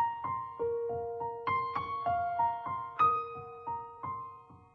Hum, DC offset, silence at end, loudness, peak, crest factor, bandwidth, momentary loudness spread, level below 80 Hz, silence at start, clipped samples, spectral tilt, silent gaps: none; under 0.1%; 0.1 s; -34 LUFS; -18 dBFS; 16 dB; 6.6 kHz; 13 LU; -66 dBFS; 0 s; under 0.1%; -7.5 dB/octave; none